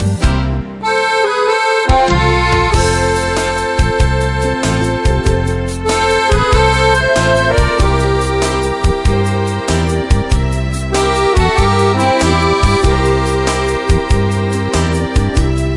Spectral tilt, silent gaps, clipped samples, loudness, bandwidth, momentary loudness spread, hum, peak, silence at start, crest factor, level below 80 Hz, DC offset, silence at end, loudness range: -5 dB/octave; none; under 0.1%; -13 LUFS; 11.5 kHz; 4 LU; none; 0 dBFS; 0 s; 12 dB; -20 dBFS; under 0.1%; 0 s; 2 LU